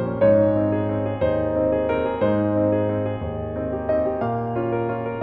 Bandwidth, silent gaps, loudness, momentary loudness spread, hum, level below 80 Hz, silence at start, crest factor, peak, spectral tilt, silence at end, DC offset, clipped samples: 4.2 kHz; none; -22 LUFS; 8 LU; none; -42 dBFS; 0 s; 16 dB; -6 dBFS; -11.5 dB/octave; 0 s; under 0.1%; under 0.1%